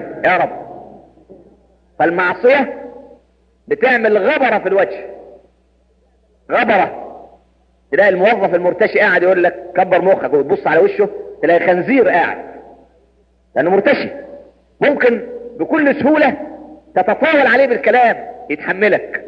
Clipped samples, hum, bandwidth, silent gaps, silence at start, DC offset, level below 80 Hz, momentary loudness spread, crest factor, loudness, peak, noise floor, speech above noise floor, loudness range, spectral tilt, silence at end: under 0.1%; none; 6 kHz; none; 0 s; under 0.1%; -56 dBFS; 14 LU; 14 dB; -14 LUFS; 0 dBFS; -55 dBFS; 42 dB; 4 LU; -7.5 dB/octave; 0 s